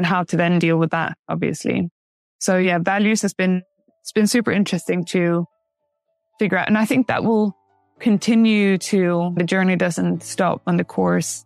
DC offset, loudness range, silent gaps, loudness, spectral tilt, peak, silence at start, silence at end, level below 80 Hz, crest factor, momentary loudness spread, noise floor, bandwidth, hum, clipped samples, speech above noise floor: under 0.1%; 3 LU; 1.19-1.24 s, 1.91-2.39 s; -19 LUFS; -5.5 dB/octave; -2 dBFS; 0 s; 0.05 s; -64 dBFS; 16 dB; 7 LU; -74 dBFS; 14 kHz; none; under 0.1%; 56 dB